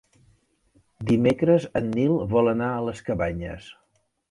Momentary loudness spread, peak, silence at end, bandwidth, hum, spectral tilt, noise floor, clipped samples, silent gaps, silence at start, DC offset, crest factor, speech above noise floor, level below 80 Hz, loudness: 14 LU; -8 dBFS; 0.6 s; 11.5 kHz; none; -8 dB/octave; -64 dBFS; under 0.1%; none; 1 s; under 0.1%; 18 dB; 41 dB; -48 dBFS; -23 LUFS